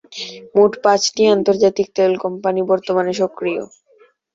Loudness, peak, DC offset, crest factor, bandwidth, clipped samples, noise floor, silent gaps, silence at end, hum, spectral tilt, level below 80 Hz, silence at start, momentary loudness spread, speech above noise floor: -17 LUFS; -2 dBFS; under 0.1%; 16 dB; 7.8 kHz; under 0.1%; -53 dBFS; none; 0.7 s; none; -4 dB/octave; -62 dBFS; 0.1 s; 11 LU; 37 dB